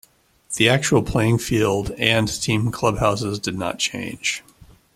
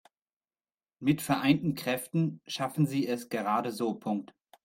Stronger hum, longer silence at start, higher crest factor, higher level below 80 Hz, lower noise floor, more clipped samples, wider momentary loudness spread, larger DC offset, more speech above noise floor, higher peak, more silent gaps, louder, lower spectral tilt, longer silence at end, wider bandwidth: neither; second, 0.5 s vs 1 s; about the same, 22 dB vs 18 dB; first, -42 dBFS vs -70 dBFS; second, -44 dBFS vs under -90 dBFS; neither; about the same, 8 LU vs 7 LU; neither; second, 24 dB vs over 60 dB; first, 0 dBFS vs -12 dBFS; neither; first, -20 LUFS vs -30 LUFS; second, -4.5 dB/octave vs -6 dB/octave; first, 0.55 s vs 0.4 s; about the same, 15.5 kHz vs 16.5 kHz